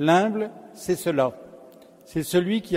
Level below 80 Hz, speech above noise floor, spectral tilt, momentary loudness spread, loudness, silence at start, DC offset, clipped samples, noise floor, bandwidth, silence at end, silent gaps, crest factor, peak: -60 dBFS; 26 dB; -5.5 dB/octave; 13 LU; -25 LUFS; 0 s; under 0.1%; under 0.1%; -49 dBFS; 16 kHz; 0 s; none; 20 dB; -6 dBFS